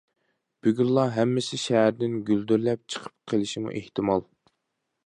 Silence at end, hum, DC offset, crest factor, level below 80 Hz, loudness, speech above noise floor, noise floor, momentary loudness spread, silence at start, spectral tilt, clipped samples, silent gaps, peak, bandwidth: 0.85 s; none; under 0.1%; 18 dB; -64 dBFS; -26 LUFS; 55 dB; -80 dBFS; 9 LU; 0.65 s; -6 dB/octave; under 0.1%; none; -8 dBFS; 11 kHz